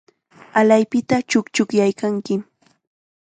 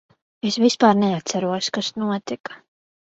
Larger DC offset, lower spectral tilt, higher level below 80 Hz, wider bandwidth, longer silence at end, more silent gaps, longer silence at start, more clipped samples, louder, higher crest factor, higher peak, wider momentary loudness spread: neither; about the same, -5 dB/octave vs -4.5 dB/octave; about the same, -62 dBFS vs -64 dBFS; first, 9.4 kHz vs 8 kHz; first, 0.8 s vs 0.6 s; second, none vs 2.40-2.44 s; about the same, 0.55 s vs 0.45 s; neither; about the same, -19 LUFS vs -21 LUFS; about the same, 18 dB vs 20 dB; about the same, -2 dBFS vs -2 dBFS; second, 9 LU vs 14 LU